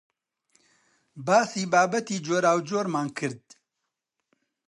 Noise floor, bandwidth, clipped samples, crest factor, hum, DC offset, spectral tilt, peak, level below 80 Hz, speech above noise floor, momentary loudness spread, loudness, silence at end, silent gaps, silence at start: -83 dBFS; 11.5 kHz; under 0.1%; 20 dB; none; under 0.1%; -4.5 dB/octave; -8 dBFS; -78 dBFS; 59 dB; 11 LU; -25 LUFS; 1.3 s; none; 1.15 s